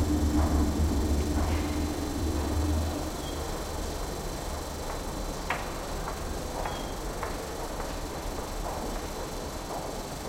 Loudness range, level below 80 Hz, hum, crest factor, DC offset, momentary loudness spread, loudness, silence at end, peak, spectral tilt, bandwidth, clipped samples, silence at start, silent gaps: 6 LU; -36 dBFS; none; 16 dB; under 0.1%; 9 LU; -32 LUFS; 0 s; -14 dBFS; -5.5 dB/octave; 16.5 kHz; under 0.1%; 0 s; none